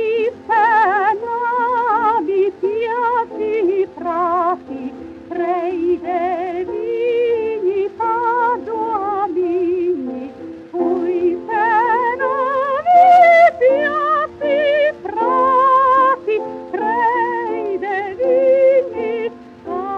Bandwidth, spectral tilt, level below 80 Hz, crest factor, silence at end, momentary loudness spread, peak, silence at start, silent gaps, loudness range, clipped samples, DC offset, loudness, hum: 7.4 kHz; -6 dB/octave; -60 dBFS; 14 dB; 0 s; 11 LU; -2 dBFS; 0 s; none; 7 LU; under 0.1%; under 0.1%; -16 LUFS; none